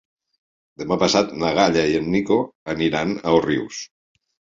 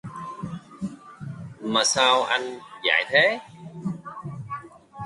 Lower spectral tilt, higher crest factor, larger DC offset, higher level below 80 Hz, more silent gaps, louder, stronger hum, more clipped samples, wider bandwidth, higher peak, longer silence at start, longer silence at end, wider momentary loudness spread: first, -5 dB/octave vs -2.5 dB/octave; about the same, 20 dB vs 22 dB; neither; first, -50 dBFS vs -62 dBFS; first, 2.55-2.66 s vs none; about the same, -20 LUFS vs -22 LUFS; neither; neither; second, 7.8 kHz vs 11.5 kHz; about the same, -2 dBFS vs -4 dBFS; first, 0.8 s vs 0.05 s; first, 0.75 s vs 0 s; second, 13 LU vs 19 LU